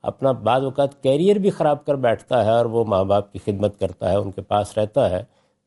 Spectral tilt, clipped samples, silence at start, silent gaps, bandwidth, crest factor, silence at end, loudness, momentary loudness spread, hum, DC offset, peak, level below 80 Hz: -7 dB/octave; under 0.1%; 0.05 s; none; 11.5 kHz; 14 dB; 0.4 s; -20 LUFS; 6 LU; none; under 0.1%; -6 dBFS; -56 dBFS